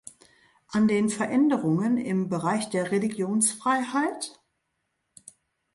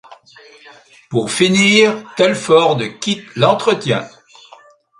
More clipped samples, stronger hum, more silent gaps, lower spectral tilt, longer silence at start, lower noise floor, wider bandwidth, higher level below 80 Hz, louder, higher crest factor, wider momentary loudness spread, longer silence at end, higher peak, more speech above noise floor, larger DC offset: neither; neither; neither; about the same, -5 dB/octave vs -4 dB/octave; first, 0.7 s vs 0.1 s; first, -78 dBFS vs -45 dBFS; about the same, 11.5 kHz vs 11.5 kHz; second, -70 dBFS vs -58 dBFS; second, -25 LUFS vs -14 LUFS; about the same, 16 dB vs 16 dB; second, 5 LU vs 11 LU; first, 1.45 s vs 0.9 s; second, -10 dBFS vs 0 dBFS; first, 53 dB vs 30 dB; neither